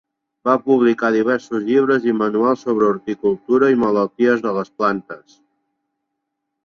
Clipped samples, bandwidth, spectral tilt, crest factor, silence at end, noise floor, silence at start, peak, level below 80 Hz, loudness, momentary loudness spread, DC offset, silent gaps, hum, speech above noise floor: under 0.1%; 7 kHz; -7 dB/octave; 16 dB; 1.5 s; -77 dBFS; 0.45 s; -2 dBFS; -62 dBFS; -18 LUFS; 6 LU; under 0.1%; none; none; 60 dB